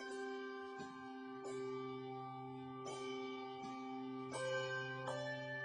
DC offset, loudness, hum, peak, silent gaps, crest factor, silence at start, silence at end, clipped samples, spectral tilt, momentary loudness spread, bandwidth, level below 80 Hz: under 0.1%; -46 LUFS; none; -32 dBFS; none; 16 dB; 0 s; 0 s; under 0.1%; -4.5 dB/octave; 8 LU; 10.5 kHz; -84 dBFS